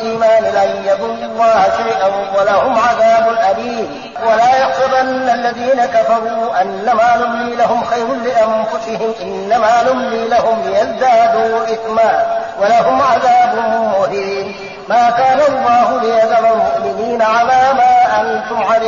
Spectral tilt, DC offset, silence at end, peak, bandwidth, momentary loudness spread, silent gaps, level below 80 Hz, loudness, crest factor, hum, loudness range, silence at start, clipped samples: -4.5 dB/octave; 0.2%; 0 s; -2 dBFS; 7.4 kHz; 7 LU; none; -50 dBFS; -13 LUFS; 10 dB; none; 2 LU; 0 s; under 0.1%